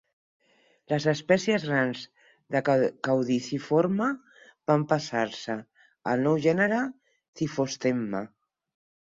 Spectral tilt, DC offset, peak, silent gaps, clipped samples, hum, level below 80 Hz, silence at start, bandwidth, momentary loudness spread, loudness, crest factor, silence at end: -6 dB/octave; under 0.1%; -8 dBFS; 7.28-7.33 s; under 0.1%; none; -68 dBFS; 0.9 s; 7.8 kHz; 12 LU; -27 LUFS; 20 dB; 0.85 s